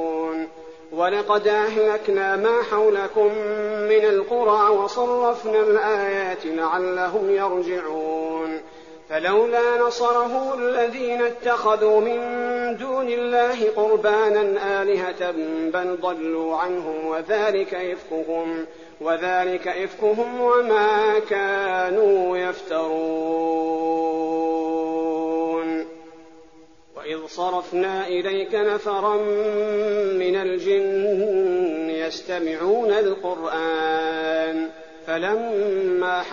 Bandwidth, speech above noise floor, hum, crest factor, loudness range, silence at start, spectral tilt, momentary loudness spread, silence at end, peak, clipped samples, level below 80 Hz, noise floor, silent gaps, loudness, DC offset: 7.2 kHz; 30 dB; none; 14 dB; 5 LU; 0 s; -2.5 dB/octave; 8 LU; 0 s; -6 dBFS; under 0.1%; -64 dBFS; -51 dBFS; none; -22 LUFS; 0.2%